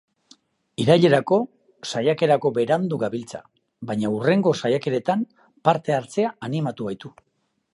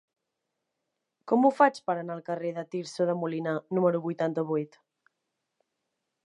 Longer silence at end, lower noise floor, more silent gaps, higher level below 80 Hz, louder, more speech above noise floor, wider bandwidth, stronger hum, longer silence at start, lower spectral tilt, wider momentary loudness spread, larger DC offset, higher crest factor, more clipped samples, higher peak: second, 0.65 s vs 1.6 s; second, -57 dBFS vs -84 dBFS; neither; first, -66 dBFS vs -86 dBFS; first, -22 LUFS vs -28 LUFS; second, 35 dB vs 56 dB; about the same, 11.5 kHz vs 11 kHz; neither; second, 0.8 s vs 1.25 s; about the same, -6.5 dB/octave vs -7 dB/octave; first, 16 LU vs 10 LU; neither; about the same, 20 dB vs 24 dB; neither; first, -2 dBFS vs -6 dBFS